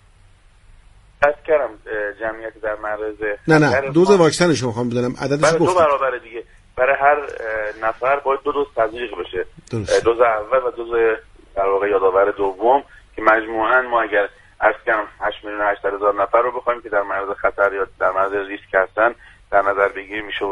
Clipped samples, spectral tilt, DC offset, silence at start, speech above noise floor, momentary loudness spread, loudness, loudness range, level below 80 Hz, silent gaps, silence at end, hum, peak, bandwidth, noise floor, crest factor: under 0.1%; -5 dB/octave; under 0.1%; 1.2 s; 31 dB; 11 LU; -19 LUFS; 3 LU; -48 dBFS; none; 0 s; none; 0 dBFS; 11.5 kHz; -50 dBFS; 18 dB